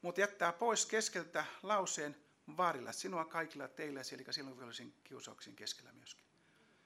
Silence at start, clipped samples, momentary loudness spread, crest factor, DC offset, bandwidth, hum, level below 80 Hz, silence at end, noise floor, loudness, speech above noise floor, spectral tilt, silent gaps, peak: 0.05 s; under 0.1%; 18 LU; 22 dB; under 0.1%; 16 kHz; none; under -90 dBFS; 0.7 s; -71 dBFS; -40 LUFS; 30 dB; -2 dB/octave; none; -18 dBFS